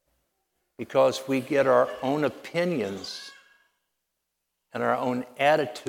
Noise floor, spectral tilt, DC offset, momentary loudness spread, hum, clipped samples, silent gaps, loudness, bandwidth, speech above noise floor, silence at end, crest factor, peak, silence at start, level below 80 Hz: -81 dBFS; -5 dB/octave; under 0.1%; 15 LU; none; under 0.1%; none; -25 LUFS; 16.5 kHz; 56 dB; 0 s; 20 dB; -8 dBFS; 0.8 s; -74 dBFS